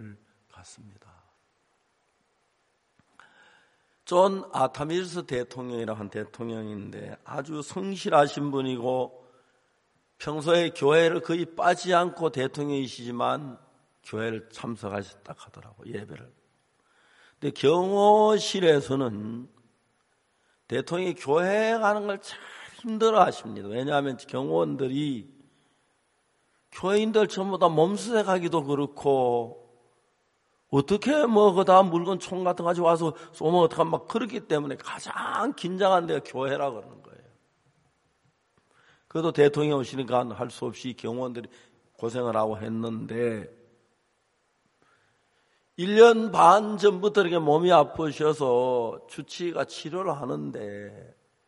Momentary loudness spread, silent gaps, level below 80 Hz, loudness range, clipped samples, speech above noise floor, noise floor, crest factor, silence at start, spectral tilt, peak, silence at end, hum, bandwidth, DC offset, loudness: 17 LU; none; -68 dBFS; 10 LU; under 0.1%; 46 dB; -71 dBFS; 24 dB; 0 s; -5.5 dB/octave; -4 dBFS; 0.45 s; none; 11.5 kHz; under 0.1%; -25 LUFS